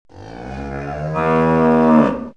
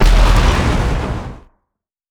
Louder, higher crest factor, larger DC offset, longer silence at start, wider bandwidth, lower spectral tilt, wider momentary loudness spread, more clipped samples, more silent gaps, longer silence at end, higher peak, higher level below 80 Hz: about the same, -15 LUFS vs -16 LUFS; about the same, 16 dB vs 14 dB; first, 0.4% vs under 0.1%; first, 0.15 s vs 0 s; second, 6.8 kHz vs 12 kHz; first, -9 dB/octave vs -5.5 dB/octave; first, 18 LU vs 13 LU; neither; neither; second, 0.05 s vs 0.75 s; about the same, -2 dBFS vs 0 dBFS; second, -38 dBFS vs -14 dBFS